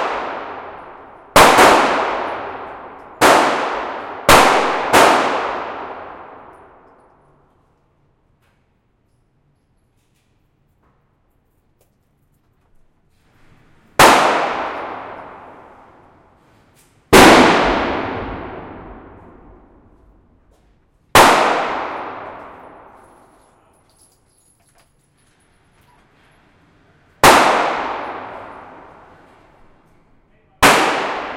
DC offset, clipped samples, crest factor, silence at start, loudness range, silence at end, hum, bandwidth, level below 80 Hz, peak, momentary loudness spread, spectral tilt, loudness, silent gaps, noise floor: under 0.1%; under 0.1%; 18 dB; 0 s; 11 LU; 0 s; none; 16.5 kHz; -42 dBFS; 0 dBFS; 25 LU; -3 dB/octave; -13 LUFS; none; -61 dBFS